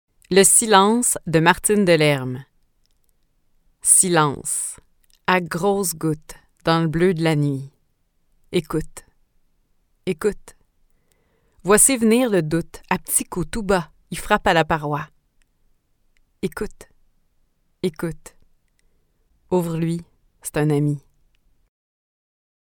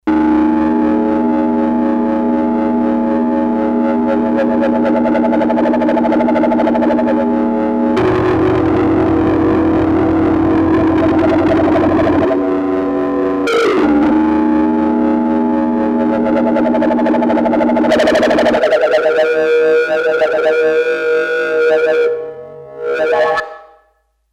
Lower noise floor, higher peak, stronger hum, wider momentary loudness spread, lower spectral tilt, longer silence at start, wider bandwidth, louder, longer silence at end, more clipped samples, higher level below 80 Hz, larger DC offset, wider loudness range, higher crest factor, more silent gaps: first, -65 dBFS vs -59 dBFS; about the same, 0 dBFS vs -2 dBFS; neither; first, 18 LU vs 3 LU; second, -4 dB/octave vs -7 dB/octave; first, 0.3 s vs 0.05 s; first, 19 kHz vs 9 kHz; second, -19 LUFS vs -13 LUFS; first, 1.8 s vs 0.7 s; neither; second, -46 dBFS vs -40 dBFS; neither; first, 12 LU vs 2 LU; first, 22 dB vs 10 dB; neither